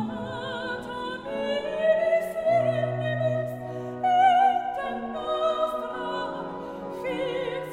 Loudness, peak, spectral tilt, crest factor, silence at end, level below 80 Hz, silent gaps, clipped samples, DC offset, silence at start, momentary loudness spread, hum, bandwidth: -27 LUFS; -10 dBFS; -6.5 dB/octave; 16 dB; 0 s; -60 dBFS; none; under 0.1%; under 0.1%; 0 s; 12 LU; none; 15.5 kHz